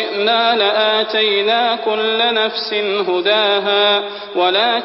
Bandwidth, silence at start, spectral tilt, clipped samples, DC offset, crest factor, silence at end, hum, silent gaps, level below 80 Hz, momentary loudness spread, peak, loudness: 5.8 kHz; 0 s; -7 dB/octave; under 0.1%; under 0.1%; 12 dB; 0 s; none; none; -64 dBFS; 4 LU; -4 dBFS; -15 LUFS